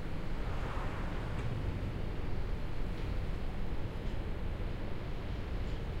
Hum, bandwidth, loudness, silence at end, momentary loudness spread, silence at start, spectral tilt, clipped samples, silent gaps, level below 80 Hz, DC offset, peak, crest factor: none; 8.8 kHz; -40 LUFS; 0 s; 3 LU; 0 s; -7.5 dB/octave; under 0.1%; none; -38 dBFS; under 0.1%; -24 dBFS; 12 dB